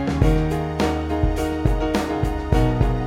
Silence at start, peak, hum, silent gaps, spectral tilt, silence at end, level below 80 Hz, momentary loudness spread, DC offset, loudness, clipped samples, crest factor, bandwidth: 0 s; -4 dBFS; none; none; -7 dB/octave; 0 s; -24 dBFS; 4 LU; under 0.1%; -22 LUFS; under 0.1%; 16 dB; 15.5 kHz